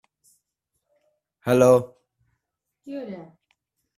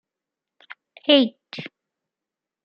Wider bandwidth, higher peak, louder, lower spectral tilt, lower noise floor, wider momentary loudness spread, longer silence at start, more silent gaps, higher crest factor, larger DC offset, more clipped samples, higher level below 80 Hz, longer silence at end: first, 14 kHz vs 6 kHz; about the same, -4 dBFS vs -2 dBFS; about the same, -19 LUFS vs -19 LUFS; about the same, -6.5 dB/octave vs -6 dB/octave; second, -81 dBFS vs -88 dBFS; first, 23 LU vs 19 LU; first, 1.45 s vs 1.1 s; neither; about the same, 22 dB vs 24 dB; neither; neither; first, -64 dBFS vs -80 dBFS; second, 0.75 s vs 0.95 s